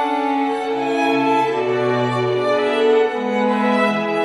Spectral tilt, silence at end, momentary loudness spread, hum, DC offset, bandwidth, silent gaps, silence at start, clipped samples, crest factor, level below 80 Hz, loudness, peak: -6 dB/octave; 0 s; 4 LU; none; under 0.1%; 12 kHz; none; 0 s; under 0.1%; 14 dB; -64 dBFS; -18 LUFS; -4 dBFS